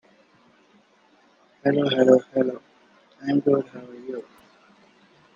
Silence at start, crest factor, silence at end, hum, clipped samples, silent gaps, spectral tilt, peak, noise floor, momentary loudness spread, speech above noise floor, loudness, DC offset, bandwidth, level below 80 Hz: 1.65 s; 22 dB; 1.15 s; none; under 0.1%; none; -7 dB/octave; -2 dBFS; -59 dBFS; 20 LU; 38 dB; -22 LUFS; under 0.1%; 7.2 kHz; -72 dBFS